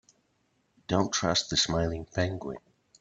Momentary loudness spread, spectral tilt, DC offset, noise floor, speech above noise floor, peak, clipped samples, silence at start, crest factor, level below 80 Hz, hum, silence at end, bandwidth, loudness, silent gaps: 15 LU; -3.5 dB/octave; under 0.1%; -72 dBFS; 44 dB; -10 dBFS; under 0.1%; 0.9 s; 20 dB; -52 dBFS; none; 0.45 s; 9 kHz; -28 LUFS; none